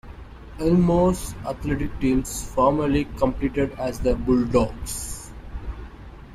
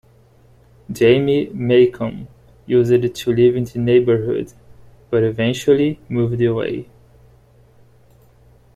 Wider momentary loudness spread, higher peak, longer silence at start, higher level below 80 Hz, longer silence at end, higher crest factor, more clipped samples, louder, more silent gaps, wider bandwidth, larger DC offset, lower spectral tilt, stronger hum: first, 19 LU vs 12 LU; second, -6 dBFS vs -2 dBFS; second, 0.05 s vs 0.9 s; first, -34 dBFS vs -50 dBFS; second, 0 s vs 1.9 s; about the same, 18 dB vs 16 dB; neither; second, -23 LUFS vs -17 LUFS; neither; first, 15 kHz vs 13.5 kHz; neither; about the same, -6.5 dB/octave vs -7 dB/octave; second, none vs 60 Hz at -40 dBFS